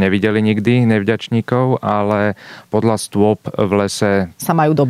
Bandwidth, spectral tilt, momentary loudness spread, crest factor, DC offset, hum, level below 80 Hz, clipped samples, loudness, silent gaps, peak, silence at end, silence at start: 15 kHz; -6.5 dB/octave; 4 LU; 14 dB; under 0.1%; none; -56 dBFS; under 0.1%; -16 LUFS; none; -2 dBFS; 0 s; 0 s